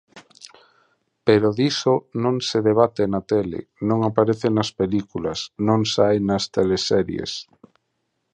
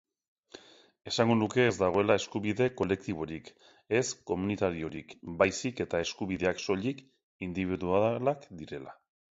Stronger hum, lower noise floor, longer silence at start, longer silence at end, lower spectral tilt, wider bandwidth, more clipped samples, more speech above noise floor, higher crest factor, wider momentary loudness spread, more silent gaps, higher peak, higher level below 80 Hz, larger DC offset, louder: neither; first, -74 dBFS vs -54 dBFS; second, 0.15 s vs 0.55 s; first, 0.9 s vs 0.45 s; about the same, -5.5 dB/octave vs -5 dB/octave; first, 9.8 kHz vs 8 kHz; neither; first, 54 dB vs 24 dB; about the same, 20 dB vs 22 dB; second, 9 LU vs 16 LU; second, none vs 7.23-7.40 s; first, -2 dBFS vs -10 dBFS; about the same, -52 dBFS vs -56 dBFS; neither; first, -21 LUFS vs -30 LUFS